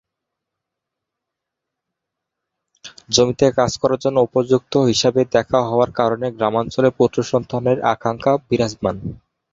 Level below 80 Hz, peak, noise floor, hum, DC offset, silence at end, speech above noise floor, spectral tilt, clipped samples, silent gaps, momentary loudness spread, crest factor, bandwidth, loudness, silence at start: -50 dBFS; -2 dBFS; -82 dBFS; none; under 0.1%; 0.35 s; 65 dB; -5 dB/octave; under 0.1%; none; 5 LU; 18 dB; 7.8 kHz; -18 LUFS; 2.85 s